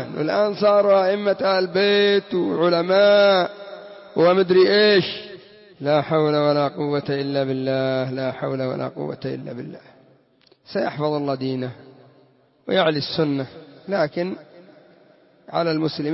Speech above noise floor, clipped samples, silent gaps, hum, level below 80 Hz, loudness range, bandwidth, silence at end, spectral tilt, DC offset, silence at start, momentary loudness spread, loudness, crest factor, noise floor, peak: 38 dB; under 0.1%; none; none; -66 dBFS; 10 LU; 6 kHz; 0 s; -9 dB/octave; under 0.1%; 0 s; 15 LU; -20 LUFS; 16 dB; -58 dBFS; -6 dBFS